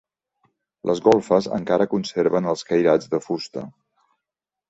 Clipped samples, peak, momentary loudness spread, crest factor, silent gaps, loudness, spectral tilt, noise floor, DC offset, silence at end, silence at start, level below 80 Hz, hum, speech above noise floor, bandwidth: under 0.1%; -2 dBFS; 12 LU; 20 dB; none; -21 LUFS; -6 dB/octave; -86 dBFS; under 0.1%; 1 s; 0.85 s; -62 dBFS; none; 66 dB; 8 kHz